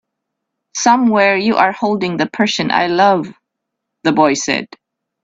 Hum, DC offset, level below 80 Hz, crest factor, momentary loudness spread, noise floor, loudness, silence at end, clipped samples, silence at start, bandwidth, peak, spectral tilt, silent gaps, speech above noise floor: none; under 0.1%; -58 dBFS; 16 dB; 9 LU; -77 dBFS; -14 LUFS; 0.6 s; under 0.1%; 0.75 s; 8 kHz; 0 dBFS; -4 dB/octave; none; 63 dB